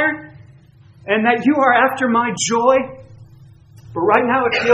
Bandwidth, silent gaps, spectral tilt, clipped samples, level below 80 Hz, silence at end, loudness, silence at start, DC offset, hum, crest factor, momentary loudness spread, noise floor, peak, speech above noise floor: 13 kHz; none; -3.5 dB/octave; under 0.1%; -56 dBFS; 0 s; -16 LUFS; 0 s; under 0.1%; none; 18 dB; 16 LU; -46 dBFS; 0 dBFS; 31 dB